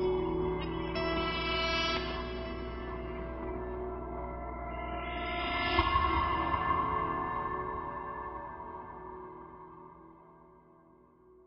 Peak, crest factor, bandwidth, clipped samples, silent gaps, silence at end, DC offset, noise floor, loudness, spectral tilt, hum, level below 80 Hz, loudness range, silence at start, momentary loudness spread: -12 dBFS; 24 dB; 6.2 kHz; under 0.1%; none; 0.05 s; under 0.1%; -61 dBFS; -34 LUFS; -3 dB/octave; none; -44 dBFS; 11 LU; 0 s; 16 LU